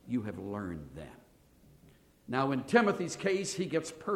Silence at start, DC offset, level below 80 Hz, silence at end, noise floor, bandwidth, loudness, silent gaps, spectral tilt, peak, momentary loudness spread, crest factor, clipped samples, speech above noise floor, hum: 0.05 s; under 0.1%; -64 dBFS; 0 s; -62 dBFS; 15.5 kHz; -32 LUFS; none; -5 dB/octave; -12 dBFS; 18 LU; 22 dB; under 0.1%; 29 dB; none